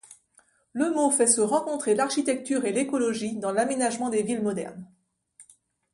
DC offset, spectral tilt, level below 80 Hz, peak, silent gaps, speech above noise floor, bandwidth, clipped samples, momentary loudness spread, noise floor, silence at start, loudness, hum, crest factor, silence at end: under 0.1%; -3.5 dB/octave; -70 dBFS; -4 dBFS; none; 38 dB; 11.5 kHz; under 0.1%; 9 LU; -63 dBFS; 0.75 s; -25 LUFS; none; 22 dB; 0.5 s